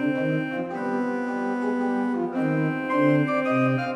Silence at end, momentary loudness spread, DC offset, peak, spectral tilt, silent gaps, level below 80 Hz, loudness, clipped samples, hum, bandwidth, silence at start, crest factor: 0 s; 6 LU; under 0.1%; -10 dBFS; -8 dB/octave; none; -72 dBFS; -25 LUFS; under 0.1%; none; 9.4 kHz; 0 s; 14 dB